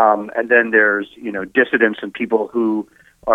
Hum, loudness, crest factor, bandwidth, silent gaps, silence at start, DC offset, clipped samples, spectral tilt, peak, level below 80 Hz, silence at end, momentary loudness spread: none; -17 LUFS; 16 dB; 4.5 kHz; none; 0 s; under 0.1%; under 0.1%; -7 dB/octave; 0 dBFS; -60 dBFS; 0 s; 13 LU